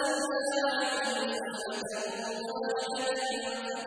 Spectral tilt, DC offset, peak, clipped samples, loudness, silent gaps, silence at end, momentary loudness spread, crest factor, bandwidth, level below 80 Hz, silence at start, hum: -1.5 dB/octave; under 0.1%; -16 dBFS; under 0.1%; -32 LUFS; none; 0 s; 6 LU; 16 dB; 11 kHz; -76 dBFS; 0 s; none